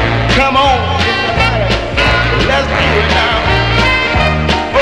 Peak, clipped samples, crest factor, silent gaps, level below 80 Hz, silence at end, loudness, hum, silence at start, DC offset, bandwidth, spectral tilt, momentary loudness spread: 0 dBFS; under 0.1%; 12 dB; none; -20 dBFS; 0 s; -11 LUFS; none; 0 s; under 0.1%; 12 kHz; -5 dB/octave; 2 LU